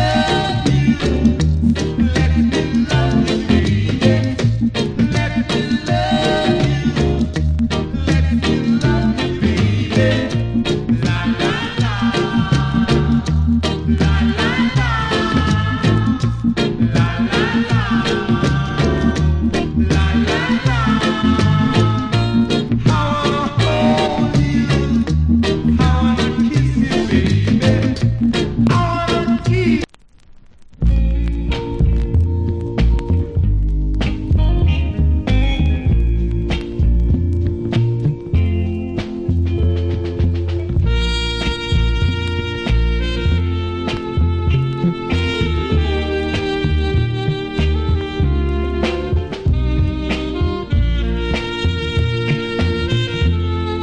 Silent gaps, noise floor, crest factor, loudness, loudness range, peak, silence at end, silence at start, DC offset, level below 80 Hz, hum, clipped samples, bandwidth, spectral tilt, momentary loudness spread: none; -44 dBFS; 16 dB; -17 LUFS; 3 LU; 0 dBFS; 0 s; 0 s; 0.3%; -22 dBFS; none; under 0.1%; 10 kHz; -7 dB/octave; 5 LU